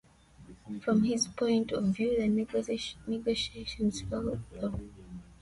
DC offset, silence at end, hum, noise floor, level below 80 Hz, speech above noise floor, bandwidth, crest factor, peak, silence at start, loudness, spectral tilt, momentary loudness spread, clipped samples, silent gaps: under 0.1%; 0.05 s; none; -55 dBFS; -52 dBFS; 24 dB; 11.5 kHz; 16 dB; -16 dBFS; 0.4 s; -31 LUFS; -5 dB/octave; 11 LU; under 0.1%; none